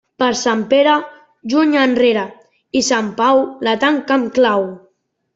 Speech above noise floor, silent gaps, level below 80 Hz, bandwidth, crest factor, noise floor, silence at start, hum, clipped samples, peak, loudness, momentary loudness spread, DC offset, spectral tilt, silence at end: 47 dB; none; -60 dBFS; 7.8 kHz; 14 dB; -62 dBFS; 0.2 s; none; under 0.1%; -2 dBFS; -15 LUFS; 8 LU; under 0.1%; -3.5 dB/octave; 0.6 s